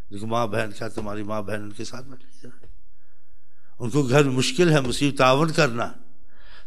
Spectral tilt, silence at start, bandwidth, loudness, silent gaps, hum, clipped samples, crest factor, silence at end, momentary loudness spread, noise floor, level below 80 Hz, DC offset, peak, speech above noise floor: -5 dB/octave; 0.1 s; 14.5 kHz; -22 LUFS; none; none; under 0.1%; 22 dB; 0.1 s; 15 LU; -62 dBFS; -52 dBFS; 4%; -4 dBFS; 39 dB